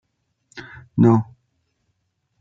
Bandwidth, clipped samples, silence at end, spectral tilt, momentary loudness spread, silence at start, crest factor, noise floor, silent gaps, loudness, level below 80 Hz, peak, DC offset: 7.6 kHz; under 0.1%; 1.15 s; -9.5 dB/octave; 23 LU; 0.55 s; 20 dB; -71 dBFS; none; -18 LUFS; -62 dBFS; -4 dBFS; under 0.1%